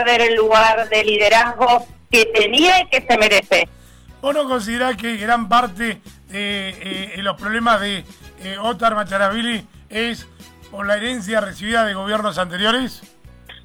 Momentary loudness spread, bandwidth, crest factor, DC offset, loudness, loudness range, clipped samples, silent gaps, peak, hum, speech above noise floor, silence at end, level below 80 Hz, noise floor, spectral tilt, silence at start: 13 LU; 19 kHz; 14 dB; under 0.1%; -17 LUFS; 8 LU; under 0.1%; none; -6 dBFS; none; 24 dB; 0.1 s; -46 dBFS; -42 dBFS; -3 dB/octave; 0 s